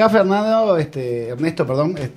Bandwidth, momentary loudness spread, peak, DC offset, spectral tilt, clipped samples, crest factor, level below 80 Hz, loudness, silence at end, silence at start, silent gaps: 14.5 kHz; 8 LU; 0 dBFS; under 0.1%; -7.5 dB/octave; under 0.1%; 18 dB; -54 dBFS; -18 LUFS; 0.05 s; 0 s; none